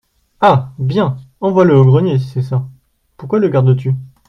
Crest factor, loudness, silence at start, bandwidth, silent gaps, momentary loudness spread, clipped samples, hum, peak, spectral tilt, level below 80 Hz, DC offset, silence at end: 14 dB; -14 LUFS; 0.4 s; 6 kHz; none; 11 LU; under 0.1%; none; 0 dBFS; -9.5 dB/octave; -50 dBFS; under 0.1%; 0.2 s